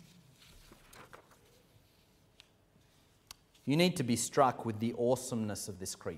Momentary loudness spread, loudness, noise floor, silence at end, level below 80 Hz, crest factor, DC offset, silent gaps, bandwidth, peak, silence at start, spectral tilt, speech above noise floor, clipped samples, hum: 25 LU; -33 LUFS; -67 dBFS; 0 s; -70 dBFS; 24 dB; under 0.1%; none; 16 kHz; -12 dBFS; 0.95 s; -4.5 dB/octave; 34 dB; under 0.1%; none